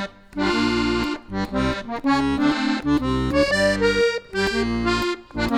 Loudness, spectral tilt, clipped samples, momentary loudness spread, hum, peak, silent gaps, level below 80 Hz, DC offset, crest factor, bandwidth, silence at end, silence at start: -22 LUFS; -5 dB/octave; under 0.1%; 7 LU; none; -4 dBFS; none; -36 dBFS; under 0.1%; 16 dB; 15.5 kHz; 0 s; 0 s